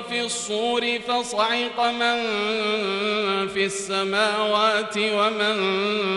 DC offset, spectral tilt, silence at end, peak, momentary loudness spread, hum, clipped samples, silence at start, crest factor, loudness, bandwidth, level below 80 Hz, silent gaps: under 0.1%; -2.5 dB/octave; 0 s; -8 dBFS; 4 LU; none; under 0.1%; 0 s; 16 dB; -22 LUFS; 11.5 kHz; -64 dBFS; none